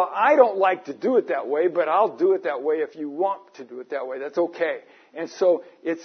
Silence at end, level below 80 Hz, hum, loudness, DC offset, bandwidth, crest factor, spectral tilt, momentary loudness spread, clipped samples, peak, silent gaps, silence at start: 0 s; -88 dBFS; none; -23 LUFS; under 0.1%; 6.4 kHz; 20 dB; -5.5 dB/octave; 16 LU; under 0.1%; -2 dBFS; none; 0 s